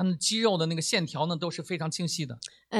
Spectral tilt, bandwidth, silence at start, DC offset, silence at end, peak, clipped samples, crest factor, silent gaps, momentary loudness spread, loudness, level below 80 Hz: -4 dB/octave; 13 kHz; 0 s; under 0.1%; 0 s; -12 dBFS; under 0.1%; 16 dB; none; 8 LU; -28 LUFS; -72 dBFS